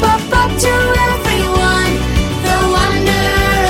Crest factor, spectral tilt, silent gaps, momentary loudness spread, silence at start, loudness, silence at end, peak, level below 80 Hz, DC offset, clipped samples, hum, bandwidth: 12 dB; -4.5 dB/octave; none; 3 LU; 0 s; -13 LUFS; 0 s; -2 dBFS; -20 dBFS; under 0.1%; under 0.1%; none; 16.5 kHz